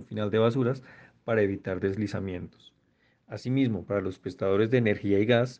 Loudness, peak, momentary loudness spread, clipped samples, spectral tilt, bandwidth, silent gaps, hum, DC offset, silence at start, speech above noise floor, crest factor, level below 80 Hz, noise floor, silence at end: -28 LUFS; -8 dBFS; 14 LU; under 0.1%; -8 dB/octave; 8.4 kHz; none; none; under 0.1%; 0 s; 41 dB; 20 dB; -64 dBFS; -68 dBFS; 0.05 s